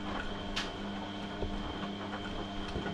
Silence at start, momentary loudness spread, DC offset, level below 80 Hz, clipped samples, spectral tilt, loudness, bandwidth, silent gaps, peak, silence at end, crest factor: 0 s; 3 LU; under 0.1%; -46 dBFS; under 0.1%; -5 dB/octave; -39 LUFS; 12 kHz; none; -22 dBFS; 0 s; 16 dB